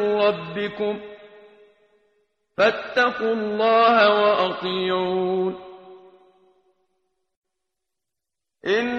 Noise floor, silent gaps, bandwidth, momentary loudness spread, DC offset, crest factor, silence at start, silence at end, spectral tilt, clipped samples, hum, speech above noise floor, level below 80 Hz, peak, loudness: -86 dBFS; 7.37-7.42 s; 7.2 kHz; 17 LU; under 0.1%; 20 dB; 0 s; 0 s; -5.5 dB/octave; under 0.1%; none; 65 dB; -66 dBFS; -4 dBFS; -21 LUFS